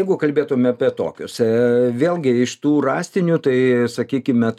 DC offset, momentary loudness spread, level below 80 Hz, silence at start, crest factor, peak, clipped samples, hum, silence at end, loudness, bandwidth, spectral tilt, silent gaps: under 0.1%; 5 LU; -64 dBFS; 0 s; 12 dB; -4 dBFS; under 0.1%; none; 0.05 s; -18 LUFS; 12.5 kHz; -6.5 dB/octave; none